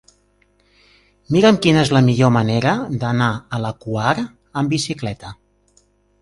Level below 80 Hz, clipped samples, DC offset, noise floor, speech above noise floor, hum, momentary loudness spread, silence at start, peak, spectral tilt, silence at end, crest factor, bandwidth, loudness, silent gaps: -48 dBFS; under 0.1%; under 0.1%; -59 dBFS; 43 dB; 50 Hz at -45 dBFS; 12 LU; 1.3 s; 0 dBFS; -6 dB/octave; 0.9 s; 18 dB; 11.5 kHz; -17 LUFS; none